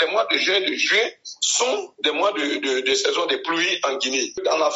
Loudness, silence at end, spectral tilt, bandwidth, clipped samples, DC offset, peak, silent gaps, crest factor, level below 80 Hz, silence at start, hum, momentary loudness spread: -20 LUFS; 0 s; 2 dB/octave; 8 kHz; under 0.1%; under 0.1%; -4 dBFS; none; 18 dB; -72 dBFS; 0 s; none; 5 LU